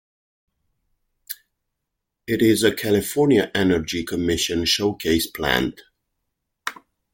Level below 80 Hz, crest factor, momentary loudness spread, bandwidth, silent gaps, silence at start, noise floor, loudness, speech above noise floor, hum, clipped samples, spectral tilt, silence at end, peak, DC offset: -48 dBFS; 20 dB; 16 LU; 17 kHz; none; 1.3 s; -80 dBFS; -20 LUFS; 60 dB; none; under 0.1%; -4 dB/octave; 0.4 s; -2 dBFS; under 0.1%